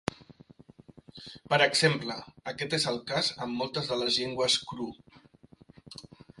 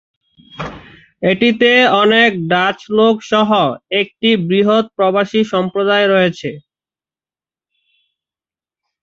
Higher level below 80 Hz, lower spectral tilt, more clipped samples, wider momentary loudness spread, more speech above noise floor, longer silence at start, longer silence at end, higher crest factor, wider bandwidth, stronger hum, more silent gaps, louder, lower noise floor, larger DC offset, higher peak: second, -64 dBFS vs -54 dBFS; second, -3.5 dB/octave vs -6 dB/octave; neither; first, 23 LU vs 10 LU; second, 28 dB vs over 77 dB; second, 0.1 s vs 0.6 s; second, 0.35 s vs 2.45 s; first, 24 dB vs 14 dB; first, 11.5 kHz vs 7.6 kHz; neither; neither; second, -28 LUFS vs -13 LUFS; second, -58 dBFS vs under -90 dBFS; neither; second, -8 dBFS vs 0 dBFS